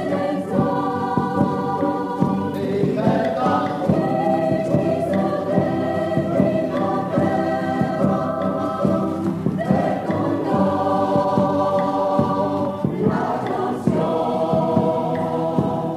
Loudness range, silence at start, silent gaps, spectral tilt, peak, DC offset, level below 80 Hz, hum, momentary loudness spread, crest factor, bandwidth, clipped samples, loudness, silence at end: 1 LU; 0 s; none; -8.5 dB/octave; -4 dBFS; under 0.1%; -52 dBFS; none; 3 LU; 16 dB; 13.5 kHz; under 0.1%; -21 LUFS; 0 s